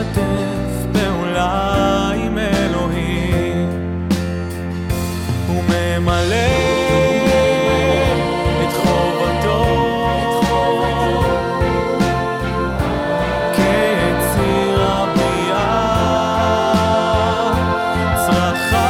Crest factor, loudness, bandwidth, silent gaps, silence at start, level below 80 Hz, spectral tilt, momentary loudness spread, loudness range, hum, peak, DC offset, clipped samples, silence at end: 12 dB; -17 LUFS; 17 kHz; none; 0 s; -30 dBFS; -5.5 dB/octave; 5 LU; 3 LU; none; -4 dBFS; under 0.1%; under 0.1%; 0 s